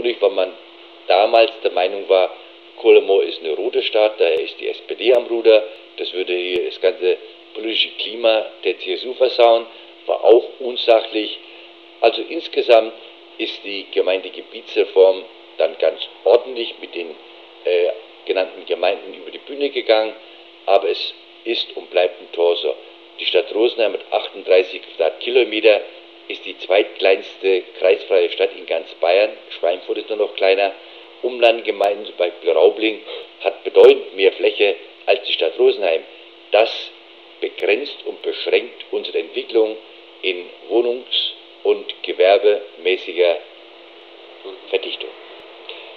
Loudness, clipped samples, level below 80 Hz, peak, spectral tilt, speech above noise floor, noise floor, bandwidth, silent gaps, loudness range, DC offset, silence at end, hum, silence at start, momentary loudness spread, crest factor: -18 LUFS; under 0.1%; -78 dBFS; 0 dBFS; -3.5 dB/octave; 24 dB; -42 dBFS; 6.2 kHz; none; 5 LU; under 0.1%; 0 s; none; 0 s; 15 LU; 18 dB